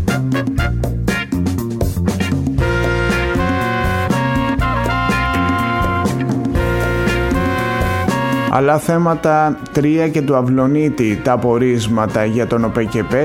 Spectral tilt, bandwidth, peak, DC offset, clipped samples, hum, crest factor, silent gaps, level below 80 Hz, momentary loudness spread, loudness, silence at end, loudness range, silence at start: -6.5 dB/octave; 16.5 kHz; 0 dBFS; under 0.1%; under 0.1%; none; 14 dB; none; -28 dBFS; 4 LU; -16 LUFS; 0 s; 2 LU; 0 s